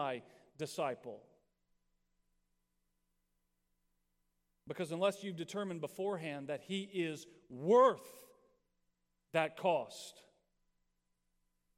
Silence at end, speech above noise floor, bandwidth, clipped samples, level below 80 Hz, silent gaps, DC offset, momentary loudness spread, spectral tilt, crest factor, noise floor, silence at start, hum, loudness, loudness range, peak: 1.65 s; 46 dB; 16 kHz; under 0.1%; -84 dBFS; none; under 0.1%; 19 LU; -5 dB/octave; 22 dB; -82 dBFS; 0 s; 60 Hz at -70 dBFS; -37 LUFS; 12 LU; -16 dBFS